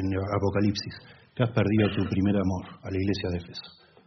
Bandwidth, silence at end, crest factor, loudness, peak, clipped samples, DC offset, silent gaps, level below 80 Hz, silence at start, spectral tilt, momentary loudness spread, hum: 6.4 kHz; 0.35 s; 18 dB; -27 LUFS; -10 dBFS; under 0.1%; under 0.1%; none; -58 dBFS; 0 s; -6.5 dB/octave; 16 LU; none